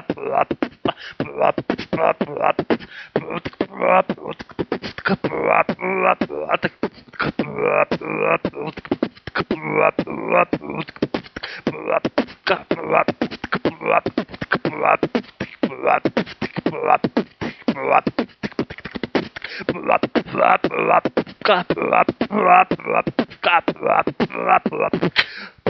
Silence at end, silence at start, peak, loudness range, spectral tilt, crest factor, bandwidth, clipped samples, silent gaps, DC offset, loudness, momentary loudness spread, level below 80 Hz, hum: 0 s; 0.1 s; 0 dBFS; 5 LU; -7 dB/octave; 20 dB; 6.2 kHz; under 0.1%; none; under 0.1%; -20 LUFS; 10 LU; -52 dBFS; none